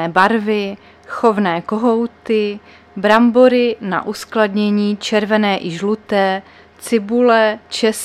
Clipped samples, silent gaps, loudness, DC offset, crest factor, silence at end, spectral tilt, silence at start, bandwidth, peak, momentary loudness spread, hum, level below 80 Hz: under 0.1%; none; -16 LUFS; under 0.1%; 16 dB; 0 s; -5 dB/octave; 0 s; 14 kHz; 0 dBFS; 11 LU; none; -58 dBFS